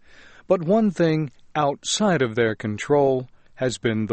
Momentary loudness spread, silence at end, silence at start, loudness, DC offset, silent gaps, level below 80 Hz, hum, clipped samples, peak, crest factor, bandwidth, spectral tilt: 8 LU; 0 s; 0.5 s; -22 LUFS; under 0.1%; none; -56 dBFS; none; under 0.1%; -6 dBFS; 16 dB; 8.8 kHz; -5 dB/octave